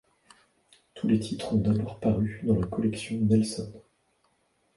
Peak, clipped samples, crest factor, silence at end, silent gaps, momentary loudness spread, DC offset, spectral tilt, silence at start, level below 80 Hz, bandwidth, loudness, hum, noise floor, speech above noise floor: -12 dBFS; under 0.1%; 18 dB; 0.95 s; none; 7 LU; under 0.1%; -7 dB/octave; 0.95 s; -50 dBFS; 11.5 kHz; -28 LUFS; none; -71 dBFS; 44 dB